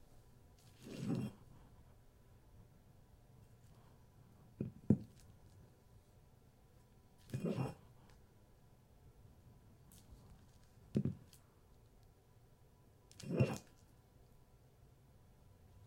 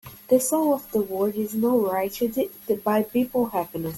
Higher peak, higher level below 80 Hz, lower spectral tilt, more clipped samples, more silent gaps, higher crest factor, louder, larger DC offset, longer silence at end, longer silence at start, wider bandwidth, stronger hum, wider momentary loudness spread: second, -16 dBFS vs -6 dBFS; second, -68 dBFS vs -60 dBFS; first, -7.5 dB/octave vs -5.5 dB/octave; neither; neither; first, 30 dB vs 16 dB; second, -42 LUFS vs -24 LUFS; neither; about the same, 0 s vs 0 s; about the same, 0.15 s vs 0.05 s; about the same, 16 kHz vs 17 kHz; neither; first, 27 LU vs 5 LU